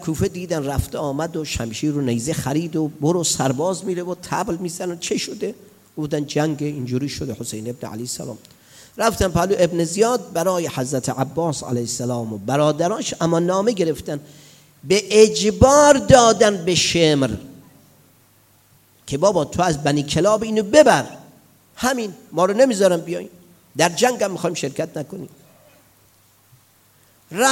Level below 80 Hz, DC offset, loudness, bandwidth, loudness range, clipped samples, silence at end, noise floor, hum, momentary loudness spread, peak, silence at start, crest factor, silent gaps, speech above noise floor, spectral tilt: -44 dBFS; under 0.1%; -19 LUFS; 17 kHz; 10 LU; under 0.1%; 0 s; -55 dBFS; none; 16 LU; 0 dBFS; 0 s; 20 dB; none; 36 dB; -4.5 dB/octave